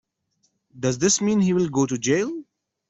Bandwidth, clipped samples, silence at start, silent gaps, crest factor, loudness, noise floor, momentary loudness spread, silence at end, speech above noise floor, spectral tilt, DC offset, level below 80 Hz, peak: 8.4 kHz; under 0.1%; 0.75 s; none; 16 dB; -22 LUFS; -70 dBFS; 9 LU; 0.45 s; 49 dB; -4.5 dB/octave; under 0.1%; -60 dBFS; -8 dBFS